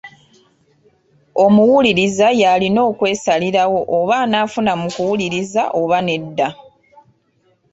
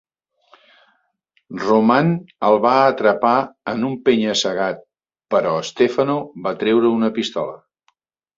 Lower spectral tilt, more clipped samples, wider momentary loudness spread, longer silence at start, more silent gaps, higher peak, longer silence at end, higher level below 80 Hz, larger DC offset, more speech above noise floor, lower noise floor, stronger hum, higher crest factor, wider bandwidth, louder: about the same, -5 dB/octave vs -5.5 dB/octave; neither; second, 8 LU vs 11 LU; second, 0.05 s vs 1.5 s; neither; about the same, -2 dBFS vs 0 dBFS; first, 1.2 s vs 0.8 s; first, -56 dBFS vs -62 dBFS; neither; second, 45 dB vs 49 dB; second, -60 dBFS vs -66 dBFS; neither; about the same, 14 dB vs 18 dB; about the same, 8 kHz vs 7.8 kHz; first, -15 LUFS vs -18 LUFS